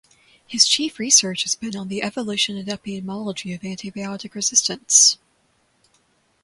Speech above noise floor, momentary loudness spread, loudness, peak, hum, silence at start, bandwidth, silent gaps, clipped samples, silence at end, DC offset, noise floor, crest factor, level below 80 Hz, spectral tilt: 42 dB; 17 LU; -18 LUFS; 0 dBFS; none; 0.5 s; 11.5 kHz; none; under 0.1%; 1.3 s; under 0.1%; -64 dBFS; 22 dB; -64 dBFS; -1 dB/octave